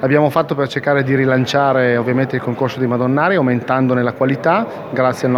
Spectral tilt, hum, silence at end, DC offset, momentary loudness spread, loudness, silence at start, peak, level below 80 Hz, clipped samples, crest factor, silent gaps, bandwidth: -7 dB/octave; none; 0 s; under 0.1%; 5 LU; -16 LUFS; 0 s; 0 dBFS; -58 dBFS; under 0.1%; 14 dB; none; 14.5 kHz